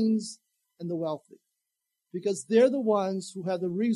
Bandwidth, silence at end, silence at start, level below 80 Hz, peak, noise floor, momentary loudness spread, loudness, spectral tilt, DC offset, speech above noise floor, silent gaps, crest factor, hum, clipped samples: 11.5 kHz; 0 s; 0 s; -84 dBFS; -10 dBFS; -84 dBFS; 18 LU; -28 LUFS; -6 dB/octave; under 0.1%; 57 dB; none; 18 dB; none; under 0.1%